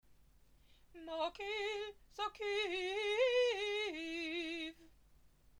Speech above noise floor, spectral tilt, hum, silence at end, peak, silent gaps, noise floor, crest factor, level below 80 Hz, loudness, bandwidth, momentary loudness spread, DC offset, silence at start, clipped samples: 28 dB; -2 dB/octave; none; 0 s; -24 dBFS; none; -66 dBFS; 18 dB; -70 dBFS; -39 LUFS; 13.5 kHz; 12 LU; under 0.1%; 0.1 s; under 0.1%